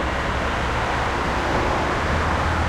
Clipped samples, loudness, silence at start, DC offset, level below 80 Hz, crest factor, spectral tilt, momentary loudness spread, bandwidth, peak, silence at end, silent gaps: under 0.1%; -22 LUFS; 0 s; under 0.1%; -30 dBFS; 12 dB; -5.5 dB/octave; 2 LU; 13.5 kHz; -10 dBFS; 0 s; none